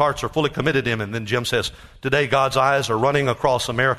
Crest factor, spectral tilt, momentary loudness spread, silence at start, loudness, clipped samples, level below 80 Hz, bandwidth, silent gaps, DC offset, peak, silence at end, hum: 16 dB; -4.5 dB/octave; 6 LU; 0 s; -20 LUFS; under 0.1%; -46 dBFS; 13.5 kHz; none; under 0.1%; -4 dBFS; 0 s; none